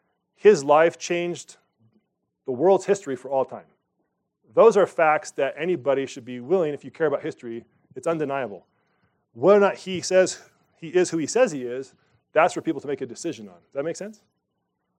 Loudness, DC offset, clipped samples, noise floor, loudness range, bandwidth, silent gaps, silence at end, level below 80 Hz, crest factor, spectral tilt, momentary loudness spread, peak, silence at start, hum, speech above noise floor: -23 LUFS; under 0.1%; under 0.1%; -77 dBFS; 5 LU; 10.5 kHz; none; 0.85 s; -80 dBFS; 20 dB; -4.5 dB/octave; 18 LU; -4 dBFS; 0.45 s; none; 54 dB